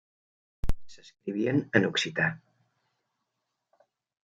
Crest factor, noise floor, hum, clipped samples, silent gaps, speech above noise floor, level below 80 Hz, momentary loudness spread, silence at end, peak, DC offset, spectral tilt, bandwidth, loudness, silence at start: 26 dB; -83 dBFS; none; under 0.1%; none; 55 dB; -44 dBFS; 16 LU; 1.85 s; -6 dBFS; under 0.1%; -5 dB/octave; 9.2 kHz; -29 LUFS; 0.65 s